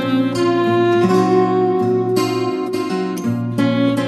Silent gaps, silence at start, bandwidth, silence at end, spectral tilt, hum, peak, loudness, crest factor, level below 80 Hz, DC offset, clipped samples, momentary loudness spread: none; 0 s; 12.5 kHz; 0 s; -6.5 dB/octave; none; -2 dBFS; -17 LUFS; 14 dB; -60 dBFS; under 0.1%; under 0.1%; 7 LU